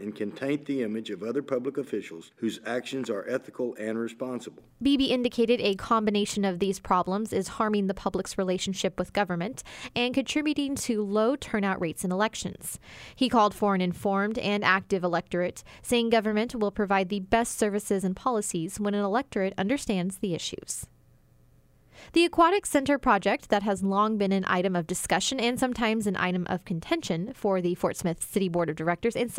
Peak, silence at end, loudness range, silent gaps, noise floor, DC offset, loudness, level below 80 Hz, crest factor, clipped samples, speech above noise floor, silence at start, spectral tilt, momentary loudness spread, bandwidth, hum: -8 dBFS; 0 s; 5 LU; none; -59 dBFS; under 0.1%; -27 LUFS; -56 dBFS; 20 dB; under 0.1%; 32 dB; 0 s; -4.5 dB/octave; 9 LU; 16 kHz; none